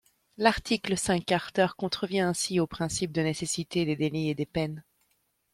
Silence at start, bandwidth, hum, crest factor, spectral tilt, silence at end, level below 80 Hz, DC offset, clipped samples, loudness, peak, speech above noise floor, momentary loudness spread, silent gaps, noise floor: 0.4 s; 15 kHz; none; 20 dB; -4.5 dB/octave; 0.7 s; -54 dBFS; under 0.1%; under 0.1%; -28 LUFS; -8 dBFS; 45 dB; 5 LU; none; -73 dBFS